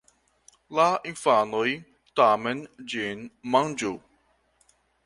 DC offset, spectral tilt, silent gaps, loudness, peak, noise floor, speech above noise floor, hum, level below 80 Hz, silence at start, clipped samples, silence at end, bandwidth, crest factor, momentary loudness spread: under 0.1%; -4 dB/octave; none; -25 LUFS; -6 dBFS; -67 dBFS; 42 dB; none; -68 dBFS; 0.7 s; under 0.1%; 1.05 s; 11.5 kHz; 20 dB; 13 LU